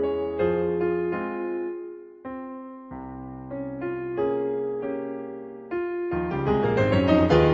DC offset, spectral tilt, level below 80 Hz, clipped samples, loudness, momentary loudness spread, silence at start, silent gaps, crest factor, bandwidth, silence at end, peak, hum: under 0.1%; -8.5 dB/octave; -46 dBFS; under 0.1%; -26 LUFS; 17 LU; 0 s; none; 20 dB; 7.4 kHz; 0 s; -6 dBFS; none